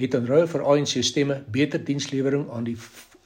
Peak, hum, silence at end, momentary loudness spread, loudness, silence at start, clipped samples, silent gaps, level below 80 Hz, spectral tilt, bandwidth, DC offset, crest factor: -6 dBFS; none; 0.25 s; 10 LU; -23 LUFS; 0 s; under 0.1%; none; -64 dBFS; -5 dB/octave; 16 kHz; under 0.1%; 18 dB